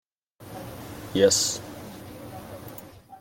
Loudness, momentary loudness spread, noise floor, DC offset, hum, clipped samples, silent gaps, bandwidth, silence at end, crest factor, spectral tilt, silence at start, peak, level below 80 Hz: -23 LUFS; 22 LU; -48 dBFS; under 0.1%; none; under 0.1%; none; 17 kHz; 0 s; 24 dB; -3 dB/octave; 0.4 s; -6 dBFS; -58 dBFS